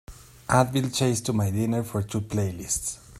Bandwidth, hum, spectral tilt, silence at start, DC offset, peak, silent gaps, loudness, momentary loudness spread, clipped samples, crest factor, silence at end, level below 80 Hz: 15.5 kHz; none; -5 dB/octave; 0.1 s; under 0.1%; -6 dBFS; none; -26 LUFS; 7 LU; under 0.1%; 20 dB; 0 s; -50 dBFS